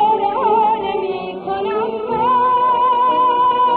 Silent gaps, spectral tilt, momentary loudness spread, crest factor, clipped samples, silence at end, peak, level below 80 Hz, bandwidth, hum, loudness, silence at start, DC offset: none; -8 dB/octave; 8 LU; 10 dB; under 0.1%; 0 s; -6 dBFS; -52 dBFS; 4.6 kHz; none; -16 LUFS; 0 s; under 0.1%